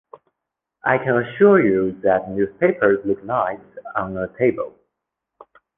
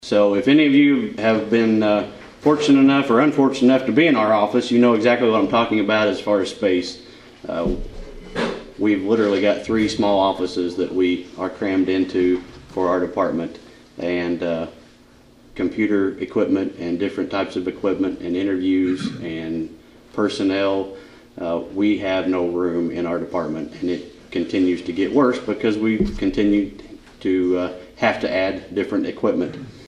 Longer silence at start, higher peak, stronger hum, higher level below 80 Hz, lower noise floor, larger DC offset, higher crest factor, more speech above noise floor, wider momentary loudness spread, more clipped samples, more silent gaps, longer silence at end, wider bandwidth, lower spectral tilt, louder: first, 0.85 s vs 0 s; about the same, -2 dBFS vs -2 dBFS; neither; second, -54 dBFS vs -44 dBFS; first, -82 dBFS vs -49 dBFS; neither; about the same, 18 dB vs 16 dB; first, 64 dB vs 30 dB; about the same, 13 LU vs 12 LU; neither; neither; first, 1.1 s vs 0 s; second, 3.7 kHz vs 10.5 kHz; first, -10.5 dB/octave vs -6 dB/octave; about the same, -19 LUFS vs -20 LUFS